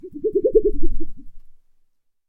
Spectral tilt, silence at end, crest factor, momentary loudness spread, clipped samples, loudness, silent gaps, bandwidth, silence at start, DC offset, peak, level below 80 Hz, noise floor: -13 dB/octave; 0.75 s; 16 dB; 18 LU; under 0.1%; -21 LUFS; none; 0.6 kHz; 0.05 s; under 0.1%; -2 dBFS; -28 dBFS; -61 dBFS